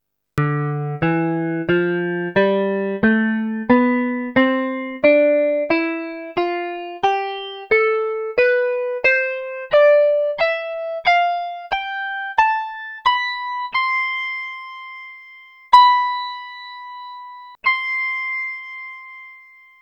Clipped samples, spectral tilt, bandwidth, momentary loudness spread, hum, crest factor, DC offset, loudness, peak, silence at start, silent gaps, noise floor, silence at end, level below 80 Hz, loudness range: under 0.1%; -7 dB/octave; 8.4 kHz; 18 LU; 50 Hz at -65 dBFS; 20 dB; under 0.1%; -19 LUFS; 0 dBFS; 0.35 s; none; -46 dBFS; 0.45 s; -56 dBFS; 4 LU